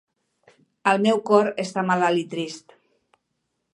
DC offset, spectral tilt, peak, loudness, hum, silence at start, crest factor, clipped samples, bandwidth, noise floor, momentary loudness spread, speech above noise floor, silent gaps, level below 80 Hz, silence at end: under 0.1%; -5.5 dB/octave; -4 dBFS; -22 LUFS; none; 0.85 s; 20 dB; under 0.1%; 11.5 kHz; -76 dBFS; 12 LU; 55 dB; none; -74 dBFS; 1.15 s